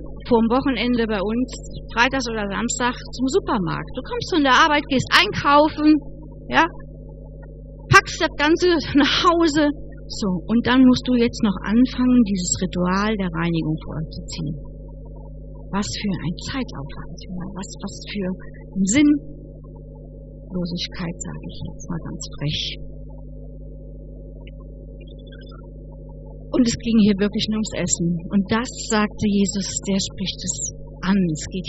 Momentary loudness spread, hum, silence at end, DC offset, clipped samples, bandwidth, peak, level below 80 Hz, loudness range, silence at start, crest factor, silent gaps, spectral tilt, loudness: 24 LU; 50 Hz at -35 dBFS; 0 s; under 0.1%; under 0.1%; 8.2 kHz; 0 dBFS; -38 dBFS; 13 LU; 0 s; 22 dB; none; -4.5 dB/octave; -20 LUFS